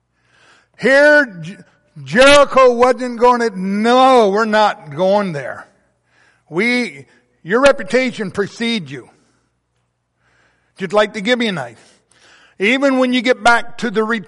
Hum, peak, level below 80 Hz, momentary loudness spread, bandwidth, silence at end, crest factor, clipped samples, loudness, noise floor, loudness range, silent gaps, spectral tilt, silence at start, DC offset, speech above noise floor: none; 0 dBFS; -46 dBFS; 16 LU; 11.5 kHz; 0.05 s; 14 dB; under 0.1%; -14 LUFS; -67 dBFS; 10 LU; none; -4.5 dB/octave; 0.8 s; under 0.1%; 53 dB